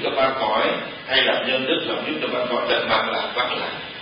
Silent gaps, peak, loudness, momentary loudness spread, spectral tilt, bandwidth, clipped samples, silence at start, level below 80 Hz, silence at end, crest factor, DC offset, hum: none; -4 dBFS; -21 LUFS; 6 LU; -8 dB/octave; 5.4 kHz; under 0.1%; 0 s; -58 dBFS; 0 s; 18 dB; under 0.1%; none